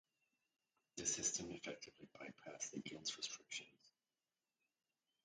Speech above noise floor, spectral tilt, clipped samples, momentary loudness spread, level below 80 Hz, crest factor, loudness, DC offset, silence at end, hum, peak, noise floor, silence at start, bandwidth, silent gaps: over 41 dB; -1 dB/octave; under 0.1%; 17 LU; -82 dBFS; 24 dB; -46 LUFS; under 0.1%; 1.35 s; none; -28 dBFS; under -90 dBFS; 0.95 s; 9.4 kHz; none